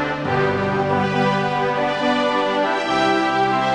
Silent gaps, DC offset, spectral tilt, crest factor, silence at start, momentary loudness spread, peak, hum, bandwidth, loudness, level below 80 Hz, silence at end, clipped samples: none; under 0.1%; -5.5 dB/octave; 12 dB; 0 s; 2 LU; -6 dBFS; none; 10 kHz; -19 LUFS; -50 dBFS; 0 s; under 0.1%